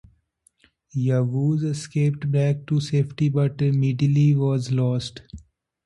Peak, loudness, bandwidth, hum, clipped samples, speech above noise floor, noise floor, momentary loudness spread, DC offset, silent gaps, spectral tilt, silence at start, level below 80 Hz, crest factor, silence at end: -10 dBFS; -22 LUFS; 11 kHz; none; under 0.1%; 43 dB; -64 dBFS; 7 LU; under 0.1%; none; -8 dB/octave; 0.95 s; -56 dBFS; 12 dB; 0.45 s